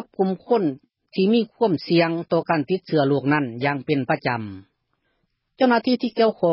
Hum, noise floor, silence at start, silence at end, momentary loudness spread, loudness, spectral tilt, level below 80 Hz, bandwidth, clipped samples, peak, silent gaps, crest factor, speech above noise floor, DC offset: none; -72 dBFS; 0 s; 0 s; 6 LU; -22 LUFS; -11 dB/octave; -64 dBFS; 5.8 kHz; under 0.1%; -6 dBFS; none; 16 dB; 51 dB; under 0.1%